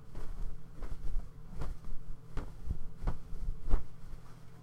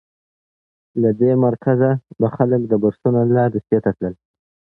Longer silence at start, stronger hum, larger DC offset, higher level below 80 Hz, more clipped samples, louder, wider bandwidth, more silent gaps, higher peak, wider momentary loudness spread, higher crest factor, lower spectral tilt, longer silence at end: second, 0 s vs 0.95 s; neither; neither; first, -38 dBFS vs -54 dBFS; neither; second, -45 LUFS vs -18 LUFS; second, 3.4 kHz vs 3.8 kHz; neither; second, -12 dBFS vs -2 dBFS; first, 12 LU vs 7 LU; about the same, 20 dB vs 16 dB; second, -7.5 dB/octave vs -13 dB/octave; second, 0 s vs 0.65 s